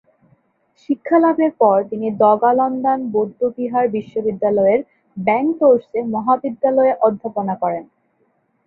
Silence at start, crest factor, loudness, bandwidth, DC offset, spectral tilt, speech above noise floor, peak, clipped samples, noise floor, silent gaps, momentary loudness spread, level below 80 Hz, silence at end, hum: 0.9 s; 16 dB; -17 LUFS; 4.2 kHz; under 0.1%; -10 dB/octave; 47 dB; -2 dBFS; under 0.1%; -63 dBFS; none; 9 LU; -64 dBFS; 0.85 s; none